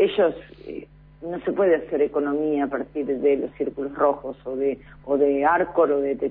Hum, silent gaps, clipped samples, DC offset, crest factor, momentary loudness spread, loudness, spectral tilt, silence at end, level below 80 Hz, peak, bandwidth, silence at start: none; none; under 0.1%; under 0.1%; 16 dB; 15 LU; -23 LUFS; -10 dB/octave; 0 s; -54 dBFS; -8 dBFS; 4.1 kHz; 0 s